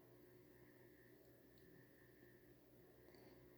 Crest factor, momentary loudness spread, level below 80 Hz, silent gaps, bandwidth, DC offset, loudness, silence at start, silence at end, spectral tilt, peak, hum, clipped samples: 18 dB; 2 LU; -84 dBFS; none; over 20 kHz; under 0.1%; -67 LUFS; 0 s; 0 s; -6 dB/octave; -50 dBFS; none; under 0.1%